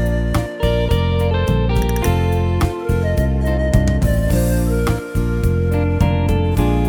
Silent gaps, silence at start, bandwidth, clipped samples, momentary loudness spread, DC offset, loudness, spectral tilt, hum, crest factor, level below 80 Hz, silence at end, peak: none; 0 s; 20 kHz; under 0.1%; 3 LU; under 0.1%; -18 LUFS; -7 dB/octave; none; 16 dB; -20 dBFS; 0 s; 0 dBFS